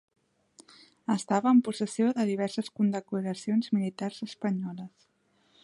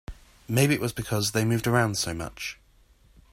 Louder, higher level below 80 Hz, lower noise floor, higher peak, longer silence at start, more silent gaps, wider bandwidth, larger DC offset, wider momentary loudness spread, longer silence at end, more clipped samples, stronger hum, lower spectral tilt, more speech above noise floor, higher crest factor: second, -29 LUFS vs -26 LUFS; second, -78 dBFS vs -50 dBFS; first, -68 dBFS vs -59 dBFS; second, -12 dBFS vs -8 dBFS; first, 0.6 s vs 0.1 s; neither; second, 11.5 kHz vs 16 kHz; neither; about the same, 12 LU vs 12 LU; about the same, 0.75 s vs 0.8 s; neither; neither; first, -6 dB/octave vs -4.5 dB/octave; first, 40 dB vs 33 dB; about the same, 18 dB vs 18 dB